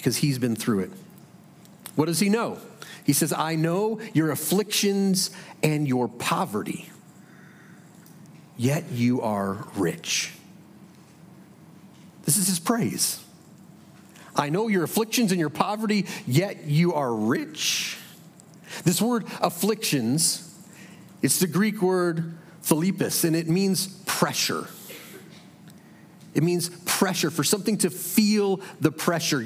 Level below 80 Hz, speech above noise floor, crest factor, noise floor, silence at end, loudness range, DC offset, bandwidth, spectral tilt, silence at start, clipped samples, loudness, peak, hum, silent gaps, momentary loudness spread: -72 dBFS; 25 dB; 22 dB; -50 dBFS; 0 s; 5 LU; under 0.1%; 16.5 kHz; -4 dB/octave; 0 s; under 0.1%; -24 LUFS; -2 dBFS; none; none; 11 LU